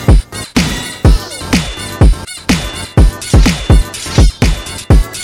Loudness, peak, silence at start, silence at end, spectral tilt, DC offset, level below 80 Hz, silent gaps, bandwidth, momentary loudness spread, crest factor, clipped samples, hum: -13 LUFS; 0 dBFS; 0 s; 0 s; -5 dB/octave; under 0.1%; -12 dBFS; none; 16 kHz; 6 LU; 10 dB; under 0.1%; none